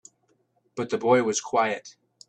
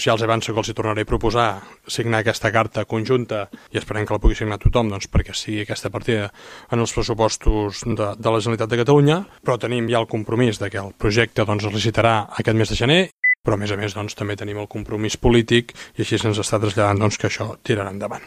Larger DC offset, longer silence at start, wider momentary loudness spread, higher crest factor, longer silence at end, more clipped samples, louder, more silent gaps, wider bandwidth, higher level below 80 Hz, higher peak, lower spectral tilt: neither; first, 0.75 s vs 0 s; first, 13 LU vs 10 LU; about the same, 20 dB vs 20 dB; first, 0.4 s vs 0 s; neither; second, -25 LUFS vs -21 LUFS; second, none vs 13.12-13.23 s, 13.37-13.43 s; second, 9.8 kHz vs 15 kHz; second, -72 dBFS vs -32 dBFS; second, -6 dBFS vs 0 dBFS; second, -4 dB/octave vs -5.5 dB/octave